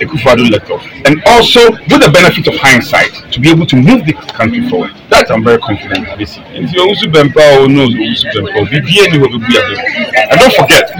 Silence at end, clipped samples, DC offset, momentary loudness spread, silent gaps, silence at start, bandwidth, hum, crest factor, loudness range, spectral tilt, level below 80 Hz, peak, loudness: 0 s; 4%; under 0.1%; 11 LU; none; 0 s; over 20 kHz; none; 8 dB; 4 LU; -4.5 dB/octave; -34 dBFS; 0 dBFS; -7 LUFS